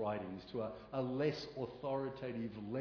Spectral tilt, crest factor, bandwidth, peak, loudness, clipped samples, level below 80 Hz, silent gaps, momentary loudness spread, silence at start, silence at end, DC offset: -6 dB/octave; 18 dB; 5.4 kHz; -24 dBFS; -42 LUFS; under 0.1%; -68 dBFS; none; 7 LU; 0 s; 0 s; under 0.1%